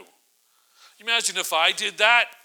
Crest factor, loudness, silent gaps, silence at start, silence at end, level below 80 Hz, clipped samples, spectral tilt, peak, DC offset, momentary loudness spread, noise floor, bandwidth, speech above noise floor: 22 dB; -20 LUFS; none; 1.05 s; 0.1 s; under -90 dBFS; under 0.1%; 1.5 dB/octave; -2 dBFS; under 0.1%; 6 LU; -64 dBFS; over 20 kHz; 42 dB